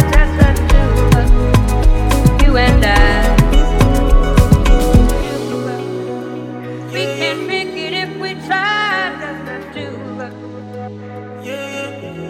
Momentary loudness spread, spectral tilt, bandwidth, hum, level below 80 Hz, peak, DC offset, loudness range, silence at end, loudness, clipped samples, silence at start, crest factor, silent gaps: 15 LU; -6 dB/octave; 15.5 kHz; none; -16 dBFS; 0 dBFS; under 0.1%; 8 LU; 0 s; -15 LUFS; under 0.1%; 0 s; 12 dB; none